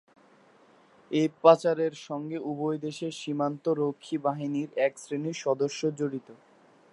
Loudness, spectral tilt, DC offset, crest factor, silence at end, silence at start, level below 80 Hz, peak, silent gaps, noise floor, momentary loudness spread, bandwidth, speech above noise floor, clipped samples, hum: -28 LUFS; -6 dB/octave; under 0.1%; 24 dB; 0.6 s; 1.1 s; -84 dBFS; -4 dBFS; none; -59 dBFS; 13 LU; 11.5 kHz; 31 dB; under 0.1%; none